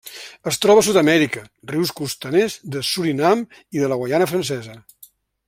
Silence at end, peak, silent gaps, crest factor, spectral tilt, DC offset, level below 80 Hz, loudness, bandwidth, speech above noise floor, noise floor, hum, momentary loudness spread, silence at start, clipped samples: 0.7 s; -2 dBFS; none; 18 dB; -4.5 dB/octave; under 0.1%; -60 dBFS; -19 LUFS; 16.5 kHz; 31 dB; -50 dBFS; none; 15 LU; 0.05 s; under 0.1%